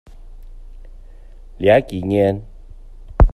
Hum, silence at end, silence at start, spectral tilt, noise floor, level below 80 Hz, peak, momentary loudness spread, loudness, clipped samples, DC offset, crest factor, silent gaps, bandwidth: none; 0 s; 0.2 s; -8.5 dB/octave; -38 dBFS; -24 dBFS; 0 dBFS; 13 LU; -17 LUFS; under 0.1%; under 0.1%; 20 dB; none; 11.5 kHz